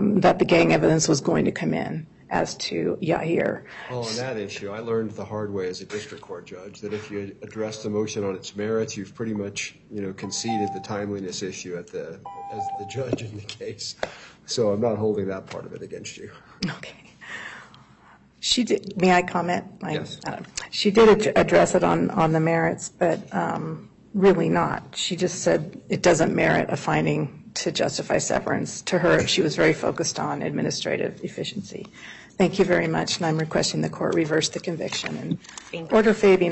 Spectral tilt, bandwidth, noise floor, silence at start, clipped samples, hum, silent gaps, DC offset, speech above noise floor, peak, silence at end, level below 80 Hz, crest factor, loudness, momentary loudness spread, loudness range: -4.5 dB/octave; 8.6 kHz; -53 dBFS; 0 s; under 0.1%; none; none; under 0.1%; 29 dB; -6 dBFS; 0 s; -54 dBFS; 18 dB; -24 LUFS; 17 LU; 10 LU